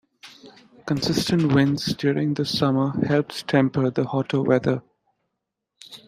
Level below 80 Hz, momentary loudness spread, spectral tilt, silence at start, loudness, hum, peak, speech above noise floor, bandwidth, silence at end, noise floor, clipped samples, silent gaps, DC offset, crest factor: -56 dBFS; 6 LU; -6 dB/octave; 0.25 s; -22 LUFS; none; -4 dBFS; 60 dB; 15.5 kHz; 0.1 s; -81 dBFS; under 0.1%; none; under 0.1%; 20 dB